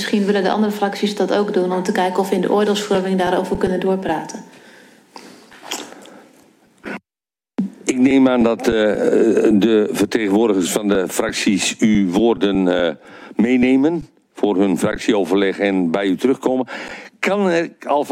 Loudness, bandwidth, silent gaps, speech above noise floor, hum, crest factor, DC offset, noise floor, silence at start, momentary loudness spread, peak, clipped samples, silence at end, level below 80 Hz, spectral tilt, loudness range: -17 LUFS; 16.5 kHz; none; over 73 dB; none; 16 dB; under 0.1%; under -90 dBFS; 0 s; 14 LU; -2 dBFS; under 0.1%; 0 s; -50 dBFS; -5 dB/octave; 9 LU